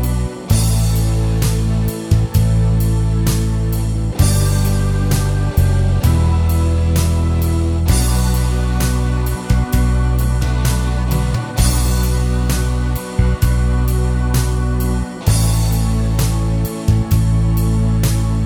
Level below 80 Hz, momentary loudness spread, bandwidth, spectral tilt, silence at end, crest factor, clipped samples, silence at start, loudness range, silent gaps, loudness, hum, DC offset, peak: -18 dBFS; 3 LU; over 20 kHz; -6 dB/octave; 0 s; 14 dB; under 0.1%; 0 s; 2 LU; none; -16 LUFS; none; under 0.1%; -2 dBFS